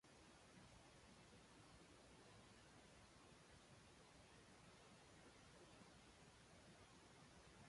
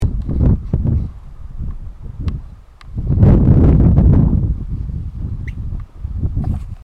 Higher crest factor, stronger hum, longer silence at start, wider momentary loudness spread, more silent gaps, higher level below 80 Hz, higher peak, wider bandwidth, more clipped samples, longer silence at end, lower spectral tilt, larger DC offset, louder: about the same, 14 dB vs 16 dB; neither; about the same, 0.05 s vs 0 s; second, 1 LU vs 19 LU; neither; second, -78 dBFS vs -20 dBFS; second, -54 dBFS vs 0 dBFS; first, 11.5 kHz vs 4.3 kHz; neither; second, 0 s vs 0.15 s; second, -3.5 dB/octave vs -11.5 dB/octave; neither; second, -67 LUFS vs -16 LUFS